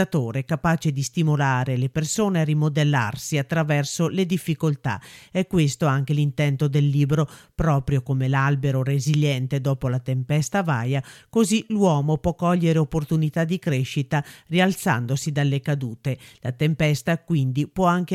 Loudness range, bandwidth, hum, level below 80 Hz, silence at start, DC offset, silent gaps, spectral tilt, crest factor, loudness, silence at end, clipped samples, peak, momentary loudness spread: 2 LU; 14.5 kHz; none; -46 dBFS; 0 s; under 0.1%; none; -6 dB/octave; 16 dB; -23 LUFS; 0 s; under 0.1%; -6 dBFS; 6 LU